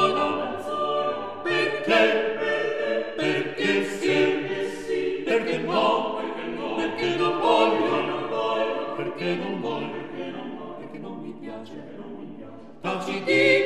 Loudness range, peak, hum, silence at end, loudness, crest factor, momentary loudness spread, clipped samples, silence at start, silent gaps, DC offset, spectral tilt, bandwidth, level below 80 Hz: 9 LU; -6 dBFS; none; 0 s; -25 LUFS; 18 dB; 17 LU; under 0.1%; 0 s; none; 0.4%; -5 dB/octave; 13 kHz; -62 dBFS